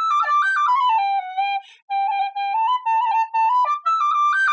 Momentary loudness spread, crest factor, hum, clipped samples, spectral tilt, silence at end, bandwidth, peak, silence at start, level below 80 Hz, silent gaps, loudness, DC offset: 6 LU; 8 dB; none; under 0.1%; 6 dB/octave; 0 s; 8 kHz; -10 dBFS; 0 s; under -90 dBFS; 1.82-1.88 s; -20 LUFS; under 0.1%